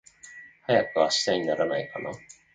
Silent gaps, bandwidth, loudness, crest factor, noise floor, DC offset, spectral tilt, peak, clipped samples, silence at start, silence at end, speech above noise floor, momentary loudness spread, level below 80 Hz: none; 9.4 kHz; -26 LUFS; 20 dB; -48 dBFS; under 0.1%; -3.5 dB/octave; -8 dBFS; under 0.1%; 0.25 s; 0.25 s; 23 dB; 22 LU; -66 dBFS